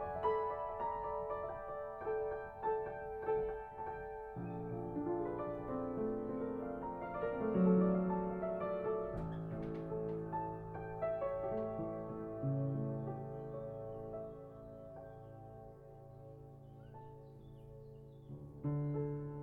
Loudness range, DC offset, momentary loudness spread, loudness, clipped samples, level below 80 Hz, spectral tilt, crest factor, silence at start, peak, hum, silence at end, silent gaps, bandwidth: 15 LU; under 0.1%; 18 LU; -40 LUFS; under 0.1%; -60 dBFS; -11 dB/octave; 20 dB; 0 s; -22 dBFS; none; 0 s; none; 4.2 kHz